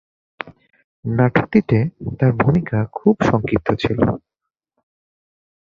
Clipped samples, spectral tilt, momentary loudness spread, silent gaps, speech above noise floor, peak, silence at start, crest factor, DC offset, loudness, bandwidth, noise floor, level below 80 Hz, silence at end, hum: under 0.1%; -8.5 dB/octave; 16 LU; 0.84-1.03 s; 66 dB; 0 dBFS; 0.45 s; 18 dB; under 0.1%; -18 LUFS; 7.2 kHz; -83 dBFS; -44 dBFS; 1.55 s; none